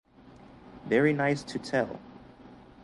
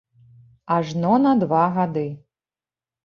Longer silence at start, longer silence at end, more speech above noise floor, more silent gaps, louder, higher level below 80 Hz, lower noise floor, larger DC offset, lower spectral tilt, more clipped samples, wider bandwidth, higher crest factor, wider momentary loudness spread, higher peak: second, 0.25 s vs 0.65 s; second, 0.3 s vs 0.85 s; second, 26 dB vs over 71 dB; neither; second, -28 LUFS vs -20 LUFS; about the same, -62 dBFS vs -64 dBFS; second, -53 dBFS vs under -90 dBFS; neither; second, -6.5 dB/octave vs -8.5 dB/octave; neither; first, 11.5 kHz vs 7 kHz; about the same, 20 dB vs 16 dB; first, 23 LU vs 12 LU; second, -12 dBFS vs -6 dBFS